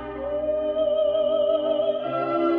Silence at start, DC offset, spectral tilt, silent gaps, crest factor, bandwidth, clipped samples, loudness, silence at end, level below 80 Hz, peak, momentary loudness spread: 0 s; under 0.1%; -8.5 dB/octave; none; 12 dB; 4.3 kHz; under 0.1%; -24 LUFS; 0 s; -52 dBFS; -12 dBFS; 4 LU